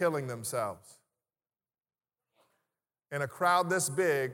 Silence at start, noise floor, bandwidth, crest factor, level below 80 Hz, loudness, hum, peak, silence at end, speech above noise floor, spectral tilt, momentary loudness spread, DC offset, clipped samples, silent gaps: 0 s; under -90 dBFS; 19 kHz; 18 dB; -82 dBFS; -31 LUFS; none; -14 dBFS; 0 s; over 59 dB; -4 dB/octave; 11 LU; under 0.1%; under 0.1%; none